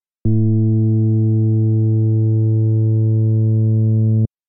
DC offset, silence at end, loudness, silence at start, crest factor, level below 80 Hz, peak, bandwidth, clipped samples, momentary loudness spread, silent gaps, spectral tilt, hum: under 0.1%; 0.2 s; -16 LUFS; 0.25 s; 8 dB; -48 dBFS; -6 dBFS; 0.9 kHz; under 0.1%; 0 LU; none; -19.5 dB/octave; none